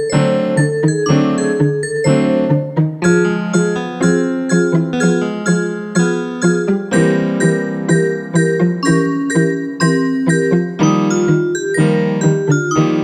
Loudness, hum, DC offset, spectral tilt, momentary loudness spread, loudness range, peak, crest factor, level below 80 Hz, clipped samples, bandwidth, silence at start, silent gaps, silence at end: -15 LUFS; none; under 0.1%; -6.5 dB/octave; 3 LU; 1 LU; -2 dBFS; 12 dB; -52 dBFS; under 0.1%; 9.6 kHz; 0 s; none; 0 s